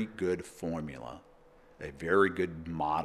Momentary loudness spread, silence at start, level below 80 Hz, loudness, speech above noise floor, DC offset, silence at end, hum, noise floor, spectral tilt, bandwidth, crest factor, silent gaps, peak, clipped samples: 19 LU; 0 s; -58 dBFS; -32 LUFS; 27 dB; under 0.1%; 0 s; none; -59 dBFS; -6.5 dB/octave; 13.5 kHz; 20 dB; none; -12 dBFS; under 0.1%